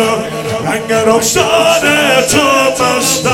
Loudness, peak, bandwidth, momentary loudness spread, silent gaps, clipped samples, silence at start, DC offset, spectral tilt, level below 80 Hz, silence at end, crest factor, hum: -10 LUFS; 0 dBFS; 17 kHz; 7 LU; none; 0.1%; 0 s; under 0.1%; -2.5 dB/octave; -42 dBFS; 0 s; 12 dB; none